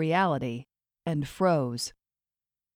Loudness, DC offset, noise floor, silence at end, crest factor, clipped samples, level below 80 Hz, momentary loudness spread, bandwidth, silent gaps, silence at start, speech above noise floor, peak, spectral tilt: -29 LUFS; under 0.1%; under -90 dBFS; 0.85 s; 18 dB; under 0.1%; -62 dBFS; 12 LU; 16 kHz; none; 0 s; over 63 dB; -12 dBFS; -5.5 dB/octave